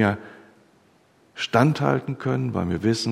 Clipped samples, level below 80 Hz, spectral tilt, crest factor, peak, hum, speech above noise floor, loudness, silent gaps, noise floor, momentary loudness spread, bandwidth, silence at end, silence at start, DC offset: under 0.1%; -54 dBFS; -6.5 dB/octave; 22 dB; -2 dBFS; none; 37 dB; -23 LUFS; none; -59 dBFS; 12 LU; 14 kHz; 0 s; 0 s; under 0.1%